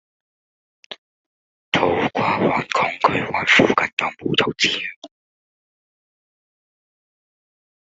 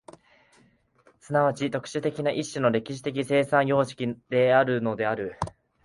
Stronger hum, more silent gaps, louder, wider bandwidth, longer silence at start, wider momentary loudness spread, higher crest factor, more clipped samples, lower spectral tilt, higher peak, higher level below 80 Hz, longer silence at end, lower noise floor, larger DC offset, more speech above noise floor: neither; first, 0.98-1.72 s, 3.93-3.97 s, 4.96-5.02 s vs none; first, -18 LUFS vs -26 LUFS; second, 8 kHz vs 11.5 kHz; second, 0.9 s vs 1.3 s; first, 18 LU vs 10 LU; about the same, 22 dB vs 20 dB; neither; second, -4 dB/octave vs -6 dB/octave; first, 0 dBFS vs -6 dBFS; about the same, -60 dBFS vs -60 dBFS; first, 2.75 s vs 0.35 s; first, under -90 dBFS vs -62 dBFS; neither; first, over 71 dB vs 37 dB